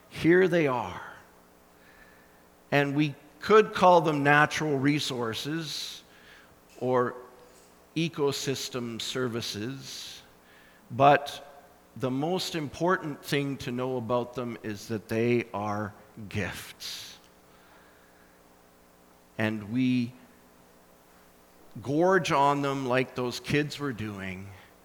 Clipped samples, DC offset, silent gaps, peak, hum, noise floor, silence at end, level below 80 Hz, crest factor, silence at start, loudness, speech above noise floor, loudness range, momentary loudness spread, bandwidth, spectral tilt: under 0.1%; under 0.1%; none; -6 dBFS; none; -58 dBFS; 0.25 s; -64 dBFS; 22 dB; 0.1 s; -27 LUFS; 31 dB; 10 LU; 17 LU; over 20 kHz; -5 dB/octave